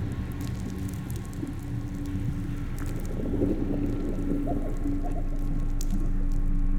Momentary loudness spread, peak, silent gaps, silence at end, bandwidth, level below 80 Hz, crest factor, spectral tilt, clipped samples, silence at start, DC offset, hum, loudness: 6 LU; -12 dBFS; none; 0 s; 15 kHz; -30 dBFS; 16 dB; -7.5 dB/octave; under 0.1%; 0 s; under 0.1%; none; -32 LUFS